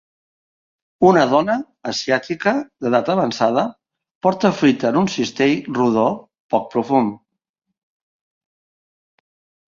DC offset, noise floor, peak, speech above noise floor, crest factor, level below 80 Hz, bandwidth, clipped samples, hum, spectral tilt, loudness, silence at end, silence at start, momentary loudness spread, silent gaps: under 0.1%; under -90 dBFS; -2 dBFS; over 73 dB; 18 dB; -60 dBFS; 7.6 kHz; under 0.1%; none; -5.5 dB/octave; -18 LUFS; 2.55 s; 1 s; 8 LU; 4.15-4.21 s, 6.40-6.49 s